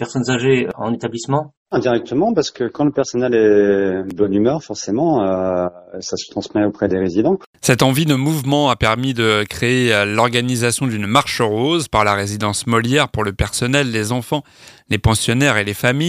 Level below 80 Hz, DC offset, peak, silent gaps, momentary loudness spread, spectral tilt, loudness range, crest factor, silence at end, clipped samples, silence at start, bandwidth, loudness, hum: -40 dBFS; under 0.1%; 0 dBFS; 1.57-1.66 s, 7.46-7.53 s; 8 LU; -5 dB/octave; 3 LU; 16 dB; 0 s; under 0.1%; 0 s; 15.5 kHz; -17 LUFS; none